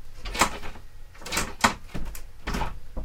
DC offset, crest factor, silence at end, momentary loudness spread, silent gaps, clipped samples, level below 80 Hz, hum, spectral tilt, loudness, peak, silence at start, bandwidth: under 0.1%; 24 dB; 0 s; 17 LU; none; under 0.1%; -36 dBFS; none; -2.5 dB/octave; -28 LUFS; -4 dBFS; 0 s; 18 kHz